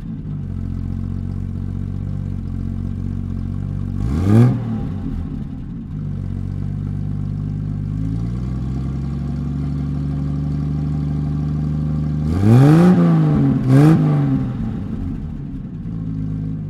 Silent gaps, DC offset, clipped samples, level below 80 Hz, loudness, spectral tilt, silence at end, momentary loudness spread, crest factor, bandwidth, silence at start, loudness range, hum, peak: none; under 0.1%; under 0.1%; -30 dBFS; -20 LUFS; -9.5 dB/octave; 0 s; 14 LU; 16 dB; 11.5 kHz; 0 s; 11 LU; none; -2 dBFS